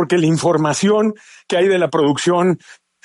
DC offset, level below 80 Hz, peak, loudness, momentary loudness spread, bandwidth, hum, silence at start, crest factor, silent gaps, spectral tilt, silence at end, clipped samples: under 0.1%; -60 dBFS; -4 dBFS; -16 LUFS; 6 LU; 11.5 kHz; none; 0 s; 12 dB; none; -5.5 dB/octave; 0.3 s; under 0.1%